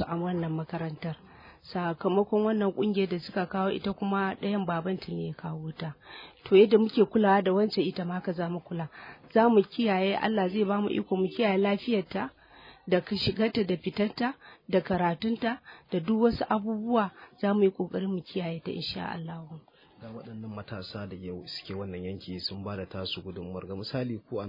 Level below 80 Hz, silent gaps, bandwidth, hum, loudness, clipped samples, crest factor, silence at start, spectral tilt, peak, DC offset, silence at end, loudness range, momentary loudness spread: -62 dBFS; none; 5.4 kHz; none; -29 LUFS; under 0.1%; 20 dB; 0 s; -8.5 dB/octave; -10 dBFS; under 0.1%; 0 s; 11 LU; 15 LU